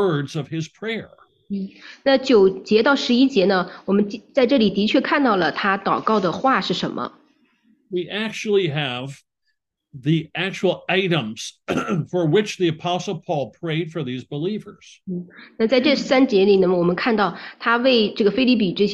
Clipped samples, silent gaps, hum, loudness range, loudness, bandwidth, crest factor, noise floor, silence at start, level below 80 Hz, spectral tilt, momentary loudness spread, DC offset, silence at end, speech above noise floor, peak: under 0.1%; none; none; 7 LU; -20 LUFS; 10.5 kHz; 16 dB; -74 dBFS; 0 s; -60 dBFS; -6 dB/octave; 13 LU; under 0.1%; 0 s; 54 dB; -4 dBFS